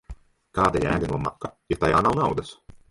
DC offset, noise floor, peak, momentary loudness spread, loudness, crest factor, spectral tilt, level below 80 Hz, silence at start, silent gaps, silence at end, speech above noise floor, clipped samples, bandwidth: under 0.1%; -44 dBFS; -6 dBFS; 12 LU; -24 LUFS; 20 dB; -6.5 dB/octave; -42 dBFS; 0.1 s; none; 0.15 s; 20 dB; under 0.1%; 11.5 kHz